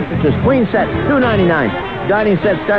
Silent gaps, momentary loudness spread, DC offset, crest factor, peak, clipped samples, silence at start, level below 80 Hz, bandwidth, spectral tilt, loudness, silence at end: none; 4 LU; 0.8%; 12 dB; -2 dBFS; under 0.1%; 0 s; -34 dBFS; 5.8 kHz; -9.5 dB/octave; -14 LUFS; 0 s